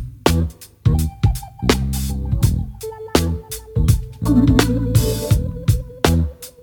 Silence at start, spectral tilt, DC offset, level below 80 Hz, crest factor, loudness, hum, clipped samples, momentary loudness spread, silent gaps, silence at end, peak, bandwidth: 0 s; -6 dB/octave; under 0.1%; -24 dBFS; 18 dB; -19 LUFS; none; under 0.1%; 9 LU; none; 0.15 s; 0 dBFS; 20 kHz